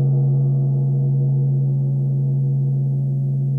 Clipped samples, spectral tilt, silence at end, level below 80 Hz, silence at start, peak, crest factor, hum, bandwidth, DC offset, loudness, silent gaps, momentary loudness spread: under 0.1%; -14.5 dB/octave; 0 s; -54 dBFS; 0 s; -12 dBFS; 6 dB; none; 0.9 kHz; under 0.1%; -19 LUFS; none; 3 LU